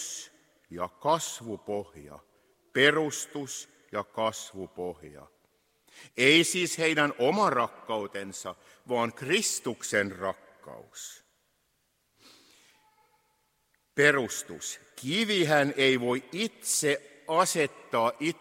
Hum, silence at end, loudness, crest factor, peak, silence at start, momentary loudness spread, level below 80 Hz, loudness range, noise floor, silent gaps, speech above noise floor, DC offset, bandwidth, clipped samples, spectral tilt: none; 0.05 s; -28 LUFS; 24 dB; -6 dBFS; 0 s; 18 LU; -72 dBFS; 7 LU; -74 dBFS; none; 45 dB; under 0.1%; 16 kHz; under 0.1%; -3 dB/octave